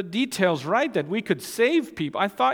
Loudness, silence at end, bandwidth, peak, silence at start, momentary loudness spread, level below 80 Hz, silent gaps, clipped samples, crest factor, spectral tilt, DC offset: -24 LUFS; 0 s; 18.5 kHz; -6 dBFS; 0 s; 5 LU; -66 dBFS; none; under 0.1%; 18 dB; -5 dB/octave; under 0.1%